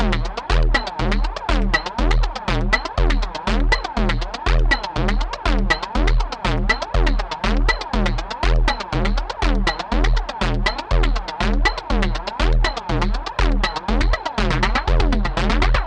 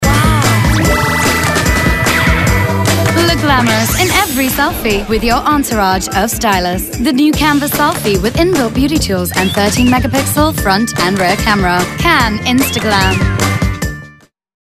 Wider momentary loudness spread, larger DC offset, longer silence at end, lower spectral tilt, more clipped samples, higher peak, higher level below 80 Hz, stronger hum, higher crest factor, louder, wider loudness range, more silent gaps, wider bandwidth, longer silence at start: about the same, 3 LU vs 3 LU; neither; second, 0 s vs 0.55 s; about the same, -5.5 dB/octave vs -4.5 dB/octave; neither; about the same, -2 dBFS vs 0 dBFS; about the same, -20 dBFS vs -24 dBFS; neither; about the same, 16 dB vs 12 dB; second, -21 LUFS vs -12 LUFS; about the same, 1 LU vs 2 LU; neither; second, 8.8 kHz vs 15.5 kHz; about the same, 0 s vs 0 s